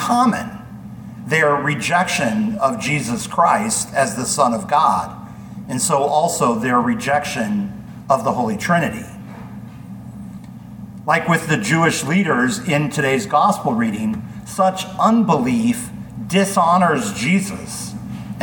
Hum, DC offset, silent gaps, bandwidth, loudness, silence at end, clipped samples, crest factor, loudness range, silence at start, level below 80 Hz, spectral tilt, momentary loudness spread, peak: none; under 0.1%; none; 19 kHz; -18 LUFS; 0 s; under 0.1%; 18 dB; 5 LU; 0 s; -50 dBFS; -4.5 dB/octave; 19 LU; -2 dBFS